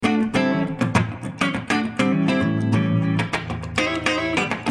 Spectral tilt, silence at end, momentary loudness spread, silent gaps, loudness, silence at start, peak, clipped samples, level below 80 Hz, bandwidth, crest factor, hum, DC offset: -6 dB/octave; 0 s; 4 LU; none; -22 LUFS; 0 s; -4 dBFS; under 0.1%; -50 dBFS; 12 kHz; 16 dB; none; under 0.1%